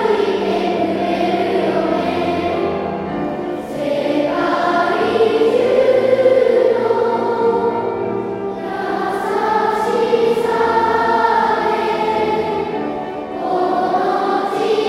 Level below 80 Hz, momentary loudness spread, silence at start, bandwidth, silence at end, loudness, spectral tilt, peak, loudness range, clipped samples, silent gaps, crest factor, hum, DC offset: -52 dBFS; 9 LU; 0 s; 13.5 kHz; 0 s; -17 LUFS; -6 dB/octave; -2 dBFS; 4 LU; under 0.1%; none; 14 dB; none; under 0.1%